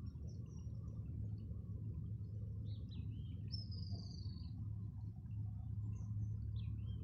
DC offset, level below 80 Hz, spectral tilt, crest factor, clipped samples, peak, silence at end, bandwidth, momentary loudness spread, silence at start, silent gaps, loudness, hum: under 0.1%; -54 dBFS; -9 dB/octave; 12 dB; under 0.1%; -34 dBFS; 0 s; 6.6 kHz; 4 LU; 0 s; none; -48 LUFS; none